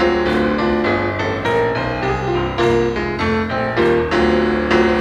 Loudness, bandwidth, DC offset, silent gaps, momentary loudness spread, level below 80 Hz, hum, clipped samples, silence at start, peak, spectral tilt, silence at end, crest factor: -17 LUFS; 9.2 kHz; under 0.1%; none; 4 LU; -34 dBFS; none; under 0.1%; 0 s; -2 dBFS; -6.5 dB/octave; 0 s; 14 dB